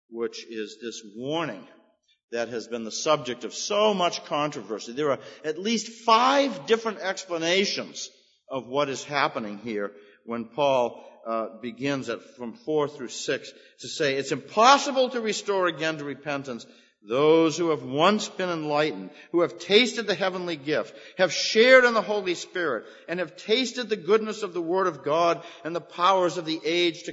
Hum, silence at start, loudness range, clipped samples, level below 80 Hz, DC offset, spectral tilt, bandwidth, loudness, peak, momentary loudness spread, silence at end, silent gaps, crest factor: none; 0.1 s; 7 LU; under 0.1%; -78 dBFS; under 0.1%; -3.5 dB/octave; 8 kHz; -25 LUFS; -2 dBFS; 15 LU; 0 s; 2.24-2.28 s; 22 dB